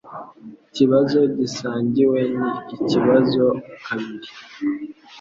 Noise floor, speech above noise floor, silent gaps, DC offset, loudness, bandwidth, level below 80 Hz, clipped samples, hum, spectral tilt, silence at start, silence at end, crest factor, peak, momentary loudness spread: -42 dBFS; 23 dB; none; under 0.1%; -20 LUFS; 7.6 kHz; -60 dBFS; under 0.1%; none; -6.5 dB/octave; 0.05 s; 0 s; 18 dB; -2 dBFS; 20 LU